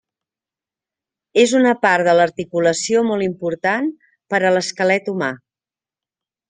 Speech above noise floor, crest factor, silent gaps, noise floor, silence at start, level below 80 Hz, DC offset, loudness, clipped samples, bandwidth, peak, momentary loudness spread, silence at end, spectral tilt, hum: over 73 dB; 18 dB; none; under -90 dBFS; 1.35 s; -64 dBFS; under 0.1%; -17 LUFS; under 0.1%; 10 kHz; -2 dBFS; 9 LU; 1.15 s; -4 dB/octave; none